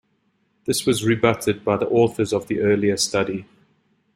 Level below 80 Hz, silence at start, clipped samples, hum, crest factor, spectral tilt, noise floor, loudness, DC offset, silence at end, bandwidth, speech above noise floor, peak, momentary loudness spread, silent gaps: -56 dBFS; 0.65 s; under 0.1%; none; 18 dB; -4.5 dB/octave; -67 dBFS; -20 LUFS; under 0.1%; 0.7 s; 16 kHz; 47 dB; -2 dBFS; 6 LU; none